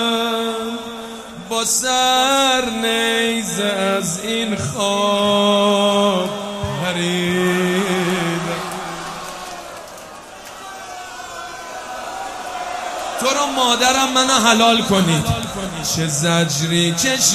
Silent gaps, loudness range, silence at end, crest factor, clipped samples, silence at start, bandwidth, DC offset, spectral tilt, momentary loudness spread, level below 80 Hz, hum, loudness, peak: none; 14 LU; 0 s; 18 dB; under 0.1%; 0 s; 15.5 kHz; under 0.1%; -3 dB/octave; 17 LU; -46 dBFS; none; -17 LUFS; 0 dBFS